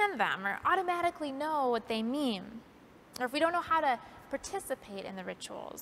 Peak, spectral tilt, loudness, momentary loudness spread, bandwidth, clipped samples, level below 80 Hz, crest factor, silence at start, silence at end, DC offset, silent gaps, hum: -14 dBFS; -3.5 dB/octave; -33 LUFS; 13 LU; 16 kHz; under 0.1%; -68 dBFS; 20 dB; 0 s; 0 s; under 0.1%; none; none